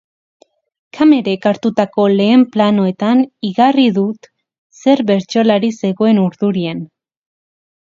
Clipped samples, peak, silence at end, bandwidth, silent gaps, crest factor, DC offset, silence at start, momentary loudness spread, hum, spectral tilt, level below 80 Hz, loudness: under 0.1%; 0 dBFS; 1.1 s; 7.6 kHz; 4.58-4.70 s; 14 dB; under 0.1%; 0.95 s; 8 LU; none; -7 dB/octave; -62 dBFS; -14 LUFS